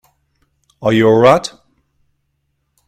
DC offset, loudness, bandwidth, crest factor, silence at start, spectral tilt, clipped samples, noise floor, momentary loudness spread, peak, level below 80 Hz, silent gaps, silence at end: under 0.1%; -12 LUFS; 14 kHz; 16 dB; 0.8 s; -6 dB/octave; under 0.1%; -68 dBFS; 12 LU; 0 dBFS; -52 dBFS; none; 1.4 s